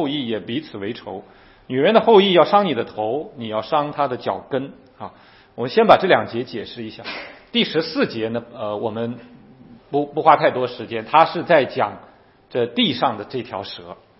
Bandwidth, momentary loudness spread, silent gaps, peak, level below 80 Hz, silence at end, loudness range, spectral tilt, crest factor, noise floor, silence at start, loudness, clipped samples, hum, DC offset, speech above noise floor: 5.8 kHz; 18 LU; none; 0 dBFS; -60 dBFS; 0.25 s; 6 LU; -8 dB/octave; 20 dB; -46 dBFS; 0 s; -19 LUFS; under 0.1%; none; under 0.1%; 26 dB